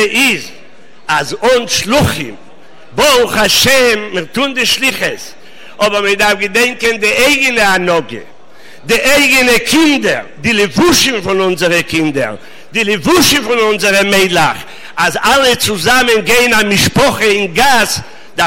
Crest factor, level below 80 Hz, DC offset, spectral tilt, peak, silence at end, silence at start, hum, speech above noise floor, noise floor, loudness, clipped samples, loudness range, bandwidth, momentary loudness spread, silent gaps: 12 dB; -38 dBFS; under 0.1%; -3 dB/octave; 0 dBFS; 0 s; 0 s; none; 30 dB; -41 dBFS; -10 LUFS; under 0.1%; 2 LU; 16.5 kHz; 10 LU; none